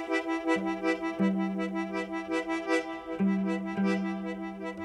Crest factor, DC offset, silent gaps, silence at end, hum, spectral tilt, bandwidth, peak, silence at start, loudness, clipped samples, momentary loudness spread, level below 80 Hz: 16 dB; under 0.1%; none; 0 s; none; -6.5 dB/octave; 10.5 kHz; -14 dBFS; 0 s; -31 LUFS; under 0.1%; 6 LU; -64 dBFS